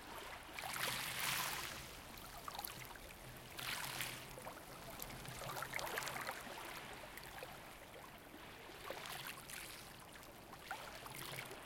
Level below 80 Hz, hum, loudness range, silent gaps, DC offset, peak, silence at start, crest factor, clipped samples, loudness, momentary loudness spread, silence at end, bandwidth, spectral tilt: -66 dBFS; none; 7 LU; none; under 0.1%; -22 dBFS; 0 s; 28 dB; under 0.1%; -47 LUFS; 14 LU; 0 s; 17 kHz; -2 dB/octave